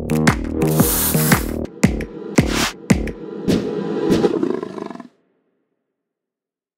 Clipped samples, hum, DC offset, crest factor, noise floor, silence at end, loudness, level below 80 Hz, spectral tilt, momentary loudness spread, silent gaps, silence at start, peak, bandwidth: under 0.1%; none; under 0.1%; 20 dB; -87 dBFS; 1.7 s; -19 LUFS; -34 dBFS; -5 dB/octave; 12 LU; none; 0 s; 0 dBFS; 16.5 kHz